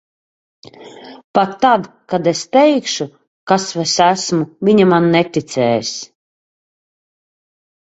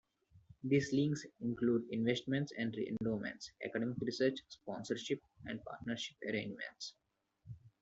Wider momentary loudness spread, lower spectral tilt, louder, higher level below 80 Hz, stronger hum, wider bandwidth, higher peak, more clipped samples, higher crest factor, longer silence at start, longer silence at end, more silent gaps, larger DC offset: about the same, 12 LU vs 12 LU; second, -4.5 dB/octave vs -6 dB/octave; first, -15 LUFS vs -39 LUFS; first, -60 dBFS vs -72 dBFS; neither; about the same, 8.2 kHz vs 8 kHz; first, 0 dBFS vs -20 dBFS; neither; about the same, 16 dB vs 20 dB; first, 0.8 s vs 0.35 s; first, 1.85 s vs 0.15 s; first, 1.24-1.34 s, 3.27-3.47 s vs none; neither